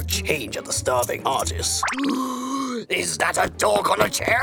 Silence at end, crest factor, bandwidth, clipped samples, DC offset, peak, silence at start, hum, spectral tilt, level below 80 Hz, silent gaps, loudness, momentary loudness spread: 0 s; 20 dB; over 20 kHz; under 0.1%; under 0.1%; -4 dBFS; 0 s; none; -3 dB/octave; -44 dBFS; none; -22 LUFS; 6 LU